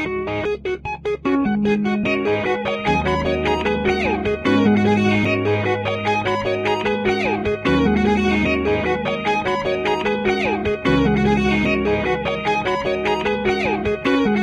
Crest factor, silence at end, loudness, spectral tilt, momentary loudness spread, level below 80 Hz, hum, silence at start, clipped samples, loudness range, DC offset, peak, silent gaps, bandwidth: 14 dB; 0 s; -19 LUFS; -6.5 dB/octave; 4 LU; -38 dBFS; none; 0 s; under 0.1%; 1 LU; under 0.1%; -4 dBFS; none; 9.8 kHz